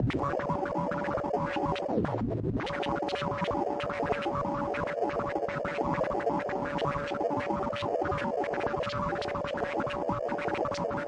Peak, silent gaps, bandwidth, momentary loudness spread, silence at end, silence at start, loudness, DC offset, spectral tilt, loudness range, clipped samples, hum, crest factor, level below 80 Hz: -14 dBFS; none; 10.5 kHz; 2 LU; 0 s; 0 s; -31 LUFS; under 0.1%; -7 dB/octave; 1 LU; under 0.1%; none; 16 dB; -52 dBFS